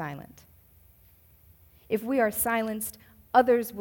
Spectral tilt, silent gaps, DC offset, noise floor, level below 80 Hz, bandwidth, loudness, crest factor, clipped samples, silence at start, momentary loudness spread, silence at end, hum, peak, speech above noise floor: -4 dB/octave; none; under 0.1%; -58 dBFS; -60 dBFS; 18 kHz; -26 LUFS; 22 dB; under 0.1%; 0 s; 14 LU; 0 s; none; -6 dBFS; 32 dB